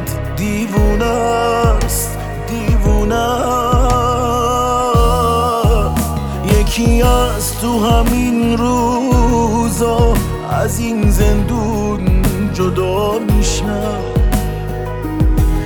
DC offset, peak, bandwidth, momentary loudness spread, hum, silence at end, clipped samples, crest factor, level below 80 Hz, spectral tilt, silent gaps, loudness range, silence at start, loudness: under 0.1%; 0 dBFS; 19 kHz; 6 LU; none; 0 s; under 0.1%; 14 dB; -18 dBFS; -6 dB/octave; none; 2 LU; 0 s; -15 LUFS